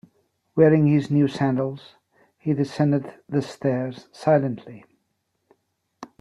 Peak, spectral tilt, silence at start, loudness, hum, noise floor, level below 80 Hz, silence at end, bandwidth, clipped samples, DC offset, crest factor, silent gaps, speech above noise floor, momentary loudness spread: -4 dBFS; -8.5 dB/octave; 0.55 s; -22 LUFS; none; -74 dBFS; -64 dBFS; 0.15 s; 10.5 kHz; under 0.1%; under 0.1%; 20 dB; none; 52 dB; 12 LU